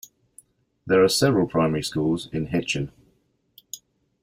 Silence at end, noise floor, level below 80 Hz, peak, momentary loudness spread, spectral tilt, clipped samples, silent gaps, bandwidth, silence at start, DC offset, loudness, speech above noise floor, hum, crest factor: 0.45 s; -66 dBFS; -54 dBFS; -6 dBFS; 21 LU; -5 dB/octave; under 0.1%; none; 16 kHz; 0.85 s; under 0.1%; -22 LUFS; 44 dB; none; 18 dB